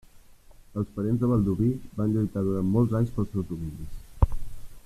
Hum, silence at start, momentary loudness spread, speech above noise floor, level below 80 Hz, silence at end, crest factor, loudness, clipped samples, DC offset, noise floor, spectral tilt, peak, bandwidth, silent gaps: none; 0.15 s; 15 LU; 25 dB; -36 dBFS; 0.05 s; 22 dB; -27 LUFS; under 0.1%; under 0.1%; -51 dBFS; -10 dB/octave; -6 dBFS; 14 kHz; none